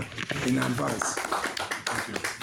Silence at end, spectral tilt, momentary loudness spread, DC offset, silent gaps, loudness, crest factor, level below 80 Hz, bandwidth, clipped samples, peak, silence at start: 0 s; -3.5 dB/octave; 4 LU; under 0.1%; none; -29 LUFS; 20 dB; -58 dBFS; over 20 kHz; under 0.1%; -10 dBFS; 0 s